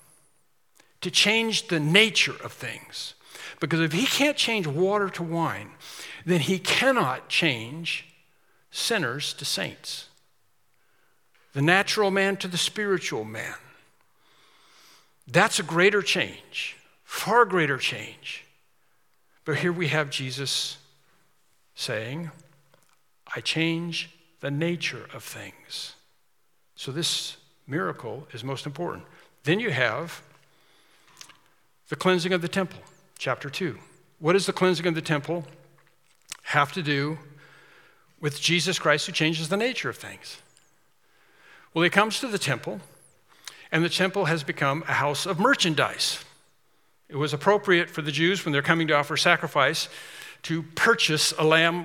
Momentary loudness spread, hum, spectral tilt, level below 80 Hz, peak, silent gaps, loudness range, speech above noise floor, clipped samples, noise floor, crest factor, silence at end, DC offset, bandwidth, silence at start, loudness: 17 LU; none; -3.5 dB/octave; -76 dBFS; 0 dBFS; none; 8 LU; 47 dB; under 0.1%; -72 dBFS; 28 dB; 0 s; under 0.1%; 17.5 kHz; 1 s; -25 LUFS